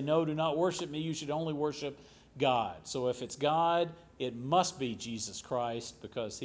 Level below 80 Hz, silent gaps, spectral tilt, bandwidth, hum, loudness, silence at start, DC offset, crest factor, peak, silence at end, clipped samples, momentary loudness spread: -66 dBFS; none; -4.5 dB/octave; 8 kHz; none; -33 LUFS; 0 s; under 0.1%; 18 dB; -16 dBFS; 0 s; under 0.1%; 10 LU